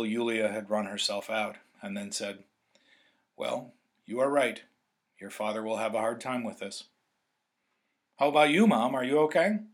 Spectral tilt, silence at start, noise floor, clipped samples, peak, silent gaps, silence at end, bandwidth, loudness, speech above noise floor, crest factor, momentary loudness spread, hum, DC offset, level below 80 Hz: -4.5 dB/octave; 0 s; -80 dBFS; under 0.1%; -8 dBFS; none; 0.05 s; 15 kHz; -29 LUFS; 51 dB; 22 dB; 17 LU; none; under 0.1%; -88 dBFS